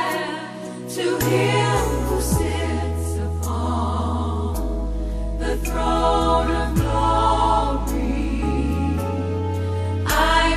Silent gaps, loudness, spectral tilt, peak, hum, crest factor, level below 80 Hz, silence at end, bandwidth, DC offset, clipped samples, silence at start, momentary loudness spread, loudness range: none; -22 LUFS; -5.5 dB/octave; -6 dBFS; none; 16 dB; -28 dBFS; 0 s; 14 kHz; under 0.1%; under 0.1%; 0 s; 8 LU; 4 LU